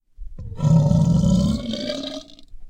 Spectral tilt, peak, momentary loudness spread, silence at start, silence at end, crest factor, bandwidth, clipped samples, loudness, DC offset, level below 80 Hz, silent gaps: -7.5 dB/octave; -4 dBFS; 20 LU; 0.2 s; 0 s; 16 dB; 9.2 kHz; under 0.1%; -20 LUFS; under 0.1%; -34 dBFS; none